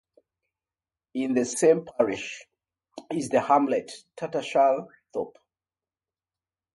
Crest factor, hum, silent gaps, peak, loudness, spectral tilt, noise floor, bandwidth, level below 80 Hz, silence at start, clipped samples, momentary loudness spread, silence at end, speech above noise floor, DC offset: 20 dB; none; none; -8 dBFS; -25 LUFS; -4.5 dB/octave; under -90 dBFS; 11.5 kHz; -70 dBFS; 1.15 s; under 0.1%; 15 LU; 1.45 s; over 65 dB; under 0.1%